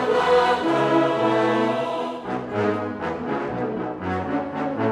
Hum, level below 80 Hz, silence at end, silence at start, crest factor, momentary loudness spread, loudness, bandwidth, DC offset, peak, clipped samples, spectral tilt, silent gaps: none; -56 dBFS; 0 s; 0 s; 16 dB; 9 LU; -23 LUFS; 11 kHz; under 0.1%; -6 dBFS; under 0.1%; -6.5 dB/octave; none